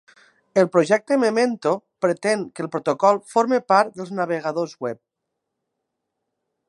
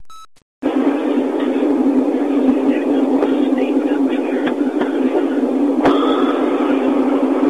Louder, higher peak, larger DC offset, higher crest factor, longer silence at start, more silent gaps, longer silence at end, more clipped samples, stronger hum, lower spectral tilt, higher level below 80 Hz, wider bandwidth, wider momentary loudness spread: second, -21 LUFS vs -16 LUFS; about the same, -2 dBFS vs -4 dBFS; second, under 0.1% vs 0.4%; first, 20 dB vs 10 dB; first, 0.55 s vs 0 s; second, none vs 0.42-0.62 s; first, 1.75 s vs 0 s; neither; neither; about the same, -5.5 dB/octave vs -6 dB/octave; second, -76 dBFS vs -56 dBFS; first, 11.5 kHz vs 9.2 kHz; first, 10 LU vs 3 LU